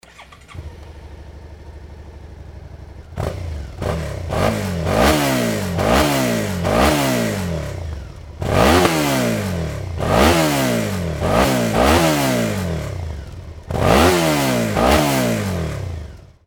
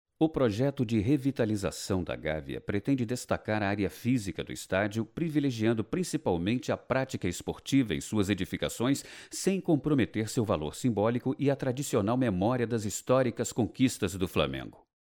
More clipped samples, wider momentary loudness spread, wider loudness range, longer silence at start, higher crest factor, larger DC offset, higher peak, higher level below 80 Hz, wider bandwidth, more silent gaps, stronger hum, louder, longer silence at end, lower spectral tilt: neither; first, 24 LU vs 6 LU; first, 12 LU vs 2 LU; about the same, 0.2 s vs 0.2 s; about the same, 18 dB vs 18 dB; neither; first, 0 dBFS vs -10 dBFS; first, -30 dBFS vs -54 dBFS; about the same, over 20 kHz vs 19.5 kHz; neither; neither; first, -18 LUFS vs -30 LUFS; about the same, 0.2 s vs 0.3 s; about the same, -5 dB/octave vs -6 dB/octave